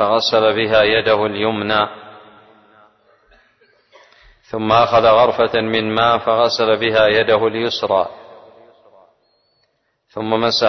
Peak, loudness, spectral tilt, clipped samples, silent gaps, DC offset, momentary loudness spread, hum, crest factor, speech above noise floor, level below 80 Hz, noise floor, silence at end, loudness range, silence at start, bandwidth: -2 dBFS; -15 LUFS; -5 dB/octave; under 0.1%; none; under 0.1%; 10 LU; none; 16 dB; 51 dB; -50 dBFS; -66 dBFS; 0 s; 9 LU; 0 s; 6.4 kHz